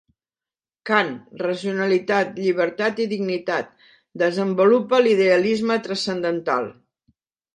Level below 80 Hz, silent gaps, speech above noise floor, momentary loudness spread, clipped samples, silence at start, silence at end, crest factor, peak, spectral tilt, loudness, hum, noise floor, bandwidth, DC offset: -70 dBFS; none; over 70 dB; 10 LU; under 0.1%; 0.85 s; 0.85 s; 20 dB; -2 dBFS; -5.5 dB/octave; -21 LUFS; none; under -90 dBFS; 11 kHz; under 0.1%